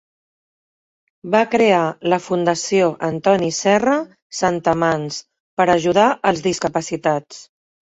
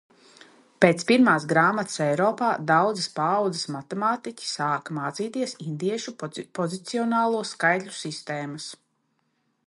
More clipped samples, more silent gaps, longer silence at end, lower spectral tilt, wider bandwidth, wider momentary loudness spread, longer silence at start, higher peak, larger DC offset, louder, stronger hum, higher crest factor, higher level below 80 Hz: neither; first, 4.22-4.30 s, 5.40-5.57 s vs none; second, 0.5 s vs 0.9 s; about the same, -4.5 dB/octave vs -5 dB/octave; second, 8.4 kHz vs 11.5 kHz; second, 8 LU vs 13 LU; first, 1.25 s vs 0.8 s; about the same, -2 dBFS vs 0 dBFS; neither; first, -18 LUFS vs -24 LUFS; neither; second, 18 dB vs 24 dB; first, -56 dBFS vs -72 dBFS